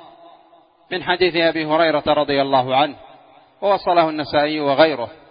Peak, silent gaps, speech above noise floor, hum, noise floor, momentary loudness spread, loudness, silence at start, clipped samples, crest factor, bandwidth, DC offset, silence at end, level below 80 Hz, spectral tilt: 0 dBFS; none; 34 dB; none; -52 dBFS; 7 LU; -18 LUFS; 0.9 s; under 0.1%; 18 dB; 5.2 kHz; under 0.1%; 0.2 s; -56 dBFS; -10 dB/octave